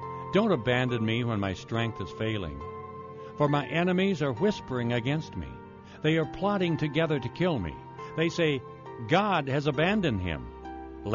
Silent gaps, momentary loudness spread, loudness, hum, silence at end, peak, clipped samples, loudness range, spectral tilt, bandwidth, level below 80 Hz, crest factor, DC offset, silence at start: none; 16 LU; -28 LUFS; none; 0 s; -12 dBFS; under 0.1%; 2 LU; -5 dB/octave; 7.2 kHz; -52 dBFS; 16 dB; under 0.1%; 0 s